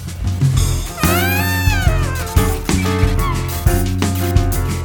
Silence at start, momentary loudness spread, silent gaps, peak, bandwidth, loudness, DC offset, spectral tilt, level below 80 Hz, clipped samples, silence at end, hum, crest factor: 0 s; 4 LU; none; 0 dBFS; 19.5 kHz; -17 LUFS; under 0.1%; -5 dB/octave; -22 dBFS; under 0.1%; 0 s; none; 14 dB